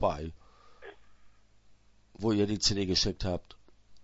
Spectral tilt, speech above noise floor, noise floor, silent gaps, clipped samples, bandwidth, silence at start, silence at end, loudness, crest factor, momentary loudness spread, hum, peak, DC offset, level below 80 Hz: -4.5 dB/octave; 30 dB; -60 dBFS; none; under 0.1%; 8 kHz; 0 s; 0 s; -30 LUFS; 20 dB; 25 LU; none; -12 dBFS; under 0.1%; -48 dBFS